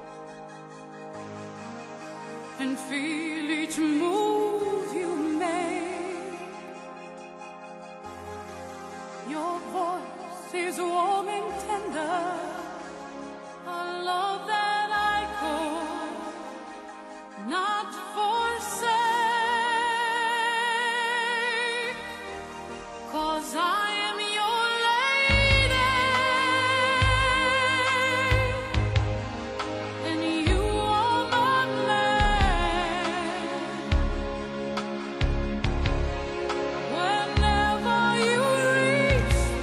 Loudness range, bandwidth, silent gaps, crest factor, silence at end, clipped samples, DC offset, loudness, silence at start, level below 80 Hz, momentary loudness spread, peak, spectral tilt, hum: 10 LU; 12.5 kHz; none; 18 dB; 0 s; under 0.1%; under 0.1%; -26 LUFS; 0 s; -36 dBFS; 18 LU; -8 dBFS; -4.5 dB/octave; none